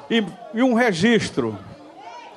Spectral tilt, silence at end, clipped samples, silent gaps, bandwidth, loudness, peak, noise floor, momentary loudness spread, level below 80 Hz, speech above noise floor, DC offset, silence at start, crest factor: -5 dB/octave; 0 s; under 0.1%; none; 12 kHz; -20 LUFS; -4 dBFS; -40 dBFS; 22 LU; -56 dBFS; 20 dB; under 0.1%; 0 s; 18 dB